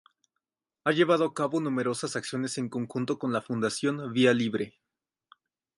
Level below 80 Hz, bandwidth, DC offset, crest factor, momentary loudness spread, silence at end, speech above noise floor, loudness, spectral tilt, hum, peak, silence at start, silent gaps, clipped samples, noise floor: -74 dBFS; 11.5 kHz; under 0.1%; 20 dB; 9 LU; 1.1 s; 58 dB; -28 LUFS; -5 dB/octave; none; -10 dBFS; 0.85 s; none; under 0.1%; -86 dBFS